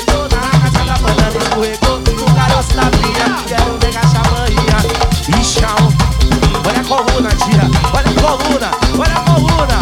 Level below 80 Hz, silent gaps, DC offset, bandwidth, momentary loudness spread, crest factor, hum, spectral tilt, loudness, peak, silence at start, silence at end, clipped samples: -18 dBFS; none; under 0.1%; 17 kHz; 3 LU; 12 dB; none; -5 dB/octave; -12 LUFS; 0 dBFS; 0 s; 0 s; under 0.1%